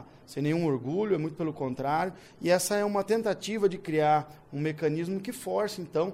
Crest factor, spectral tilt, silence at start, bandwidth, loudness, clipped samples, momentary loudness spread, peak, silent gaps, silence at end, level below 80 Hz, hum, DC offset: 16 dB; -5.5 dB/octave; 0 s; 16 kHz; -29 LUFS; under 0.1%; 8 LU; -14 dBFS; none; 0 s; -66 dBFS; none; under 0.1%